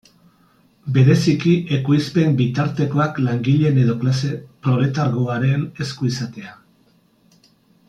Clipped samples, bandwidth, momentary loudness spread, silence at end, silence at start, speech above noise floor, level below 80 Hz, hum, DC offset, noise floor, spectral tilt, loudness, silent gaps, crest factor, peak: under 0.1%; 9 kHz; 11 LU; 1.35 s; 0.85 s; 40 dB; -56 dBFS; none; under 0.1%; -57 dBFS; -7.5 dB/octave; -19 LUFS; none; 16 dB; -4 dBFS